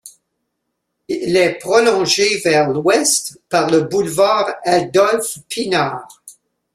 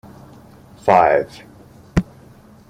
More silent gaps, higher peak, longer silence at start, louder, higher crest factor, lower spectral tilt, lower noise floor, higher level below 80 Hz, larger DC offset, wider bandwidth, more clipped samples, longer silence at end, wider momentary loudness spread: neither; about the same, -2 dBFS vs 0 dBFS; second, 0.05 s vs 0.85 s; about the same, -15 LUFS vs -17 LUFS; about the same, 16 dB vs 20 dB; second, -3 dB/octave vs -7 dB/octave; first, -74 dBFS vs -45 dBFS; second, -58 dBFS vs -40 dBFS; neither; about the same, 15.5 kHz vs 15 kHz; neither; second, 0.45 s vs 0.65 s; second, 9 LU vs 17 LU